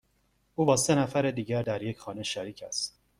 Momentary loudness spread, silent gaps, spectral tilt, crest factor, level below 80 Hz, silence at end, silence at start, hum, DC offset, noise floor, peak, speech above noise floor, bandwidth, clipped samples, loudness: 12 LU; none; -4.5 dB/octave; 20 dB; -62 dBFS; 0.3 s; 0.6 s; none; under 0.1%; -71 dBFS; -10 dBFS; 42 dB; 15.5 kHz; under 0.1%; -29 LUFS